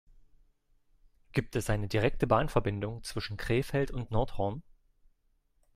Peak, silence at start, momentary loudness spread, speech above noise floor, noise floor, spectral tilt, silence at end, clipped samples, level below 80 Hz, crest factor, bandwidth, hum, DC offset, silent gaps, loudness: -10 dBFS; 1.35 s; 10 LU; 41 dB; -71 dBFS; -6.5 dB/octave; 1.15 s; under 0.1%; -44 dBFS; 22 dB; 15.5 kHz; none; under 0.1%; none; -32 LUFS